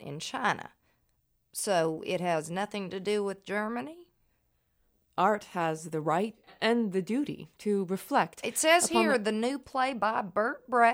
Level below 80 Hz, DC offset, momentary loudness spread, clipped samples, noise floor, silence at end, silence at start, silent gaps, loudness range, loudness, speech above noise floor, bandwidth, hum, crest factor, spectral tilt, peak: -72 dBFS; under 0.1%; 12 LU; under 0.1%; -74 dBFS; 0 s; 0 s; none; 6 LU; -30 LUFS; 44 dB; over 20 kHz; none; 20 dB; -3.5 dB/octave; -10 dBFS